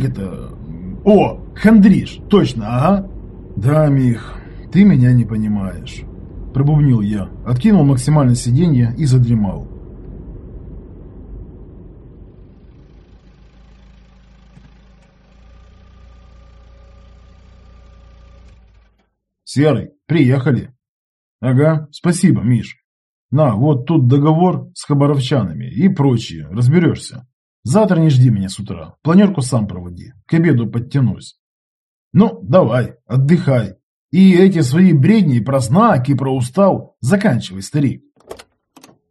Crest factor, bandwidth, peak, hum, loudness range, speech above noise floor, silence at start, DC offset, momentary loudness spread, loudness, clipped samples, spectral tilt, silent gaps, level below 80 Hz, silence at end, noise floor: 16 dB; 12 kHz; 0 dBFS; none; 6 LU; 51 dB; 0 s; under 0.1%; 20 LU; -14 LUFS; under 0.1%; -7.5 dB/octave; 20.88-21.39 s, 22.84-23.29 s, 27.33-27.63 s, 31.39-32.11 s, 33.83-34.09 s; -38 dBFS; 0.75 s; -64 dBFS